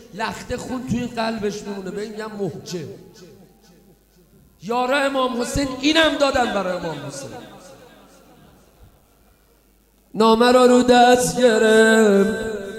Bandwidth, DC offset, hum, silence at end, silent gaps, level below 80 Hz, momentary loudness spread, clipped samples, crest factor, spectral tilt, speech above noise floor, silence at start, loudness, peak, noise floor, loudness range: 15.5 kHz; under 0.1%; none; 0 s; none; -48 dBFS; 18 LU; under 0.1%; 18 dB; -4 dB/octave; 39 dB; 0.15 s; -18 LUFS; -2 dBFS; -57 dBFS; 16 LU